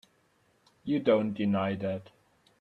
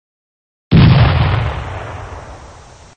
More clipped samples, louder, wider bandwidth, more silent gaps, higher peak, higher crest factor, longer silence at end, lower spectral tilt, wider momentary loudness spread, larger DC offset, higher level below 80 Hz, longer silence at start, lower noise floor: neither; second, -29 LUFS vs -12 LUFS; second, 5.4 kHz vs 7.6 kHz; neither; second, -12 dBFS vs 0 dBFS; first, 20 dB vs 14 dB; about the same, 0.6 s vs 0.5 s; about the same, -8.5 dB/octave vs -8 dB/octave; second, 12 LU vs 21 LU; neither; second, -70 dBFS vs -24 dBFS; first, 0.85 s vs 0.7 s; first, -69 dBFS vs -39 dBFS